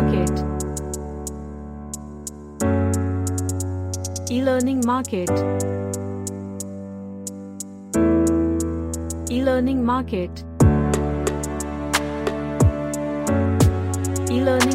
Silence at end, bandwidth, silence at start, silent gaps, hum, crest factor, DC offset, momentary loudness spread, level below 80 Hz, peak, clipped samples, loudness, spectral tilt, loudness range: 0 s; 16.5 kHz; 0 s; none; none; 18 dB; under 0.1%; 15 LU; -34 dBFS; -2 dBFS; under 0.1%; -22 LUFS; -6 dB/octave; 5 LU